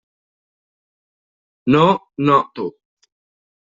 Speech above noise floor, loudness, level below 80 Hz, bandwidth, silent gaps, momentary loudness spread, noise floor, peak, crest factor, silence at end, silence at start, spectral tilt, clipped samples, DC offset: over 74 dB; -17 LUFS; -58 dBFS; 7.6 kHz; none; 14 LU; under -90 dBFS; -2 dBFS; 18 dB; 1 s; 1.65 s; -7.5 dB/octave; under 0.1%; under 0.1%